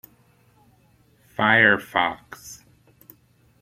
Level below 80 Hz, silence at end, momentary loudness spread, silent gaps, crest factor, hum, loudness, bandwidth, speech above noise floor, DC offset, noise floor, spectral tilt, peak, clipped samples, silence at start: -62 dBFS; 1.05 s; 24 LU; none; 22 dB; none; -19 LUFS; 16 kHz; 38 dB; under 0.1%; -59 dBFS; -4.5 dB/octave; -4 dBFS; under 0.1%; 1.4 s